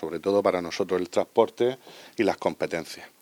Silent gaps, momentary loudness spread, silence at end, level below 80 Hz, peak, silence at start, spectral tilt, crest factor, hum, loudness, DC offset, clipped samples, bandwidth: none; 11 LU; 0.15 s; -72 dBFS; -4 dBFS; 0 s; -5 dB/octave; 22 dB; none; -26 LUFS; under 0.1%; under 0.1%; 20 kHz